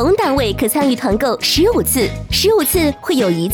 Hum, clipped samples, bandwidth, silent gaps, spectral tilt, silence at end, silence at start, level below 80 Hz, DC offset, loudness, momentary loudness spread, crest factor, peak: none; under 0.1%; over 20 kHz; none; -4 dB/octave; 0 s; 0 s; -32 dBFS; under 0.1%; -15 LUFS; 4 LU; 12 dB; -4 dBFS